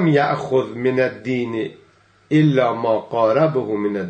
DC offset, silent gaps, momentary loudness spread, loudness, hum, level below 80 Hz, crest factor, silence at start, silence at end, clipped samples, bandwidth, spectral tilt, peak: under 0.1%; none; 7 LU; -19 LUFS; none; -64 dBFS; 16 dB; 0 s; 0 s; under 0.1%; 8.4 kHz; -8 dB/octave; -4 dBFS